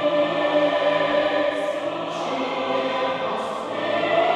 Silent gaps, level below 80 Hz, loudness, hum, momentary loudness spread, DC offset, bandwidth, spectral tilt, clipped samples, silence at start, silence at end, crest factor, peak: none; -64 dBFS; -23 LUFS; none; 7 LU; under 0.1%; 10.5 kHz; -4.5 dB/octave; under 0.1%; 0 s; 0 s; 14 dB; -8 dBFS